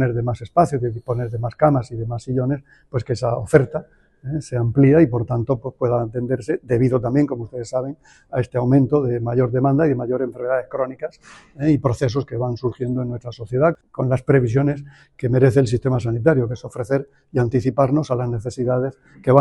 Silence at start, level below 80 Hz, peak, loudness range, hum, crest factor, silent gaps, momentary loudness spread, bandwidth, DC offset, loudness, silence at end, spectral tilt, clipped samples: 0 s; -46 dBFS; 0 dBFS; 3 LU; none; 20 dB; none; 11 LU; 11 kHz; under 0.1%; -20 LUFS; 0 s; -8.5 dB/octave; under 0.1%